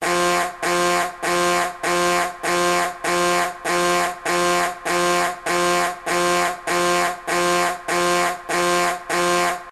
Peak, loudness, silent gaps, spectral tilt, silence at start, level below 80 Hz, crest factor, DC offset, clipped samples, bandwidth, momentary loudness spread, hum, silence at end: -6 dBFS; -20 LUFS; none; -2.5 dB/octave; 0 s; -54 dBFS; 14 dB; under 0.1%; under 0.1%; 13.5 kHz; 3 LU; none; 0 s